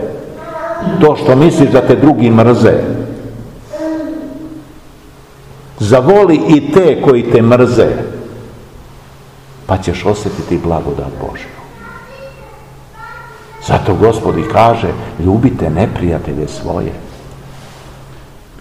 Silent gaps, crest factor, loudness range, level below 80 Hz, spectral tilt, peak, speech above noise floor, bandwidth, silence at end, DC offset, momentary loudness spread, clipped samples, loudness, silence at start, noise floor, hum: none; 12 dB; 10 LU; -34 dBFS; -7.5 dB/octave; 0 dBFS; 28 dB; 15 kHz; 0.4 s; 0.4%; 24 LU; 2%; -11 LUFS; 0 s; -37 dBFS; none